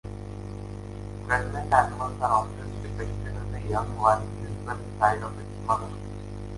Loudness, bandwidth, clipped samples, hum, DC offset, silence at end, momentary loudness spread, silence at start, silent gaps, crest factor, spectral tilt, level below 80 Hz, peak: -28 LUFS; 11.5 kHz; under 0.1%; 50 Hz at -35 dBFS; under 0.1%; 0 s; 15 LU; 0.05 s; none; 22 dB; -6.5 dB/octave; -40 dBFS; -6 dBFS